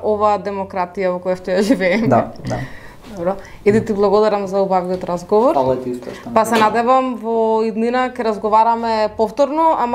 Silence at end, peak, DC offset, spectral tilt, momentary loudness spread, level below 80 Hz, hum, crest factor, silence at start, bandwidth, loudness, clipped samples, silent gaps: 0 s; 0 dBFS; under 0.1%; -6 dB/octave; 9 LU; -46 dBFS; none; 16 dB; 0 s; 15.5 kHz; -17 LUFS; under 0.1%; none